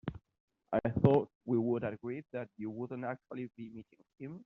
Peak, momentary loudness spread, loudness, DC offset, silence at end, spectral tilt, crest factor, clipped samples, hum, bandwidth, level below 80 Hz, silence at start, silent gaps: -12 dBFS; 20 LU; -35 LUFS; under 0.1%; 0.05 s; -8.5 dB/octave; 24 dB; under 0.1%; none; 4.8 kHz; -64 dBFS; 0.05 s; 0.40-0.48 s, 1.35-1.41 s